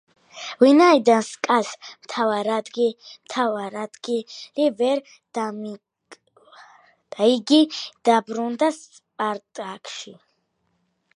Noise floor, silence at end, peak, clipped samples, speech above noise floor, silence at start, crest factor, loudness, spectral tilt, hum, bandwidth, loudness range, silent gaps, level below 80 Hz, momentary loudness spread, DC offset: -71 dBFS; 1 s; -2 dBFS; under 0.1%; 50 dB; 0.35 s; 20 dB; -21 LUFS; -4 dB/octave; none; 11 kHz; 7 LU; none; -80 dBFS; 19 LU; under 0.1%